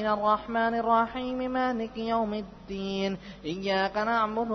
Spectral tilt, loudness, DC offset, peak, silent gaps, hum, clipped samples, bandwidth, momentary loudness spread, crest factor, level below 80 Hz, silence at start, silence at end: -6 dB/octave; -28 LUFS; under 0.1%; -12 dBFS; none; none; under 0.1%; 6.4 kHz; 11 LU; 16 dB; -54 dBFS; 0 s; 0 s